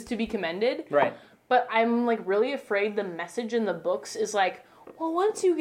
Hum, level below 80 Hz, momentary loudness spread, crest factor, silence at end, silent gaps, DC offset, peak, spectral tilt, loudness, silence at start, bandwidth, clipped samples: none; -64 dBFS; 7 LU; 16 dB; 0 s; none; under 0.1%; -10 dBFS; -4 dB/octave; -27 LUFS; 0 s; 15 kHz; under 0.1%